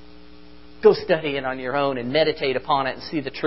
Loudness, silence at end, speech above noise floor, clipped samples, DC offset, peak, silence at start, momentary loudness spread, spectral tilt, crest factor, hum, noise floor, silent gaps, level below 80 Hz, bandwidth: -22 LUFS; 0 s; 26 dB; under 0.1%; 0.7%; -2 dBFS; 0.3 s; 8 LU; -3 dB/octave; 20 dB; none; -47 dBFS; none; -52 dBFS; 5.8 kHz